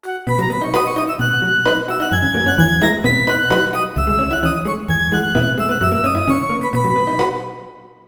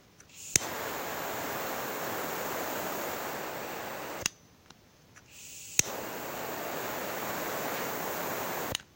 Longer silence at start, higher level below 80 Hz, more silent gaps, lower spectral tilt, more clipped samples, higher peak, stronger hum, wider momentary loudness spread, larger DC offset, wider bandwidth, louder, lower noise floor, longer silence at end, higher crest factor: about the same, 0.05 s vs 0 s; first, -34 dBFS vs -64 dBFS; neither; first, -5.5 dB/octave vs -2 dB/octave; neither; about the same, 0 dBFS vs -2 dBFS; neither; second, 5 LU vs 9 LU; neither; first, over 20 kHz vs 16 kHz; first, -17 LUFS vs -34 LUFS; second, -38 dBFS vs -58 dBFS; about the same, 0.2 s vs 0.1 s; second, 16 dB vs 34 dB